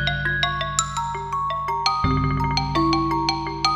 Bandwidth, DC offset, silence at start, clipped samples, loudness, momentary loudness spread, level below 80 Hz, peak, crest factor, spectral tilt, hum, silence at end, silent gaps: 13.5 kHz; under 0.1%; 0 s; under 0.1%; -22 LUFS; 5 LU; -36 dBFS; -4 dBFS; 18 dB; -4 dB/octave; none; 0 s; none